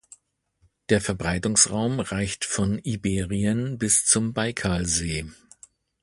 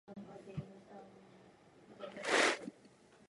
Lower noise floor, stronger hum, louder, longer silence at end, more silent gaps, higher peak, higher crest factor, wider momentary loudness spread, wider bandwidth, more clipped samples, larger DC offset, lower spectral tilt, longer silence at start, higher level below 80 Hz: about the same, -67 dBFS vs -64 dBFS; neither; first, -23 LUFS vs -35 LUFS; about the same, 0.7 s vs 0.6 s; neither; first, -2 dBFS vs -18 dBFS; about the same, 24 dB vs 24 dB; second, 9 LU vs 25 LU; about the same, 12 kHz vs 11.5 kHz; neither; neither; about the same, -3.5 dB/octave vs -2.5 dB/octave; first, 0.9 s vs 0.1 s; first, -44 dBFS vs -74 dBFS